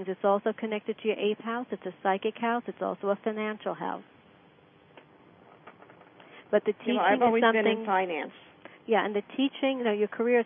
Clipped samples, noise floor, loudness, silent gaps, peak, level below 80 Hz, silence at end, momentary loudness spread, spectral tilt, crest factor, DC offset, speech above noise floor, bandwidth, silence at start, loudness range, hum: under 0.1%; -58 dBFS; -28 LUFS; none; -10 dBFS; -82 dBFS; 0 s; 11 LU; -9 dB/octave; 20 dB; under 0.1%; 30 dB; 3.7 kHz; 0 s; 9 LU; none